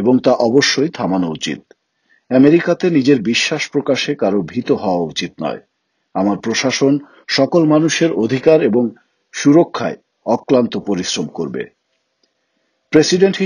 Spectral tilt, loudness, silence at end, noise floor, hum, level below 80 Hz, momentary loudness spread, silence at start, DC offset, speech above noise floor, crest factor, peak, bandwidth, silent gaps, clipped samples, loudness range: -5 dB/octave; -15 LUFS; 0 s; -67 dBFS; none; -58 dBFS; 12 LU; 0 s; under 0.1%; 52 dB; 16 dB; 0 dBFS; 11 kHz; none; under 0.1%; 4 LU